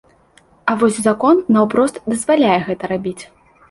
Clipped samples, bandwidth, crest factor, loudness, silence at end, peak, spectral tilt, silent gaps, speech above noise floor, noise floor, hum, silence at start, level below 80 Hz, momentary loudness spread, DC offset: under 0.1%; 11.5 kHz; 14 dB; -16 LUFS; 0.45 s; -2 dBFS; -5.5 dB/octave; none; 36 dB; -52 dBFS; none; 0.65 s; -54 dBFS; 10 LU; under 0.1%